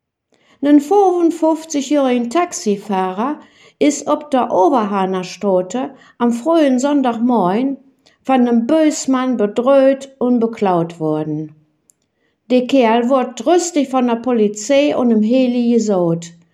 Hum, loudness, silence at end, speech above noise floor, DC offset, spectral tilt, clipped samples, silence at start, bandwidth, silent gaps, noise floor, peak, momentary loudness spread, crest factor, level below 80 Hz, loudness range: none; -15 LUFS; 0.25 s; 50 dB; under 0.1%; -5.5 dB/octave; under 0.1%; 0.6 s; 12.5 kHz; none; -65 dBFS; -2 dBFS; 7 LU; 14 dB; -68 dBFS; 3 LU